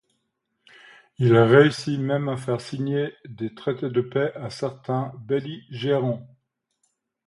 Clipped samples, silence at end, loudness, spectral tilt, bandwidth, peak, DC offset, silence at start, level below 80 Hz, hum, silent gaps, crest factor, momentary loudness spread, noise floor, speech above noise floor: under 0.1%; 1 s; -23 LUFS; -7 dB/octave; 11.5 kHz; -2 dBFS; under 0.1%; 1.2 s; -62 dBFS; none; none; 22 dB; 15 LU; -76 dBFS; 53 dB